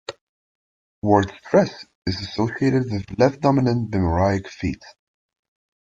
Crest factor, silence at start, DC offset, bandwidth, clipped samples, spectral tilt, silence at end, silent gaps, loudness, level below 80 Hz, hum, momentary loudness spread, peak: 20 dB; 0.1 s; under 0.1%; 7.8 kHz; under 0.1%; -7 dB/octave; 0.95 s; 0.21-1.02 s, 1.95-2.02 s; -21 LUFS; -48 dBFS; none; 10 LU; -2 dBFS